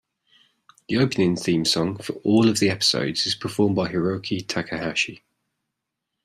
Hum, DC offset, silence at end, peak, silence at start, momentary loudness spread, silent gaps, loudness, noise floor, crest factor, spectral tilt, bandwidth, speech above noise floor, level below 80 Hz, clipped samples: none; under 0.1%; 1.1 s; -6 dBFS; 0.9 s; 8 LU; none; -22 LUFS; -82 dBFS; 18 dB; -4.5 dB/octave; 15 kHz; 59 dB; -60 dBFS; under 0.1%